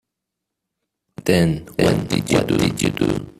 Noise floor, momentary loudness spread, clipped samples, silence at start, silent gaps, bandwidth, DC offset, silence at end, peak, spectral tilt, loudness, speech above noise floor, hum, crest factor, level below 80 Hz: -81 dBFS; 4 LU; under 0.1%; 1.2 s; none; 15 kHz; under 0.1%; 0.1 s; 0 dBFS; -5.5 dB/octave; -19 LUFS; 63 dB; none; 20 dB; -44 dBFS